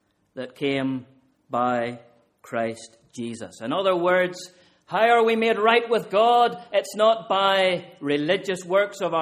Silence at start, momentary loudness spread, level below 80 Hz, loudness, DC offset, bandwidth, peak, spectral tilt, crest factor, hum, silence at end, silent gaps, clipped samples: 0.35 s; 16 LU; -70 dBFS; -22 LUFS; under 0.1%; 15 kHz; -4 dBFS; -4.5 dB/octave; 18 dB; none; 0 s; none; under 0.1%